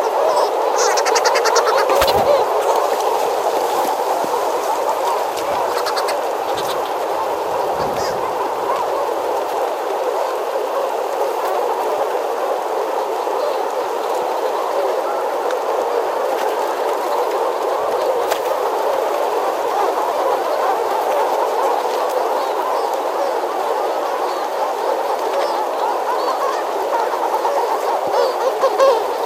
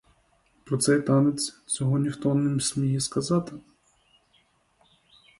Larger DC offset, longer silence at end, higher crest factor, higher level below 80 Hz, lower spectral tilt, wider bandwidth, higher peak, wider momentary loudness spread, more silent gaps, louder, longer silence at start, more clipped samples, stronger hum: neither; second, 0 s vs 1.8 s; about the same, 18 dB vs 18 dB; first, -54 dBFS vs -62 dBFS; second, -2 dB/octave vs -5.5 dB/octave; first, 16.5 kHz vs 12 kHz; first, 0 dBFS vs -10 dBFS; second, 6 LU vs 9 LU; neither; first, -18 LUFS vs -25 LUFS; second, 0 s vs 0.65 s; neither; neither